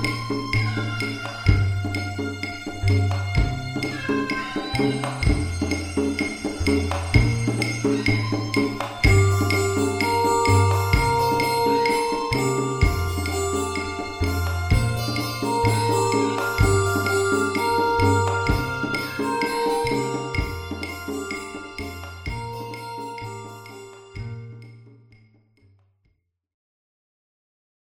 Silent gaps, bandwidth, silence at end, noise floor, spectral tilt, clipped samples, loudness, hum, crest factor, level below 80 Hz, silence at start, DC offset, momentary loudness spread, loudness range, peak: none; 18.5 kHz; 2.9 s; -69 dBFS; -5.5 dB/octave; under 0.1%; -23 LUFS; none; 20 dB; -34 dBFS; 0 s; under 0.1%; 13 LU; 14 LU; -2 dBFS